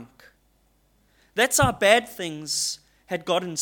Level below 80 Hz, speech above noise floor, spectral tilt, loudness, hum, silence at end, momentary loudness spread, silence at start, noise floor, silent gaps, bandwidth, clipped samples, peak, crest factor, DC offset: -48 dBFS; 41 dB; -2.5 dB/octave; -23 LUFS; none; 0 s; 14 LU; 0 s; -64 dBFS; none; 17.5 kHz; under 0.1%; -4 dBFS; 22 dB; under 0.1%